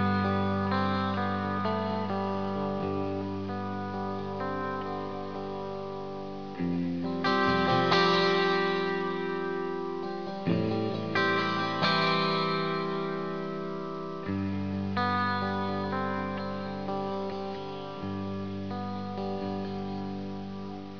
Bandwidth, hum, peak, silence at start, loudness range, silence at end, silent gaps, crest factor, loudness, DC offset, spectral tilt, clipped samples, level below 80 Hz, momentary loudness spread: 5.4 kHz; none; -12 dBFS; 0 s; 8 LU; 0 s; none; 20 dB; -30 LUFS; 0.4%; -6.5 dB/octave; under 0.1%; -66 dBFS; 11 LU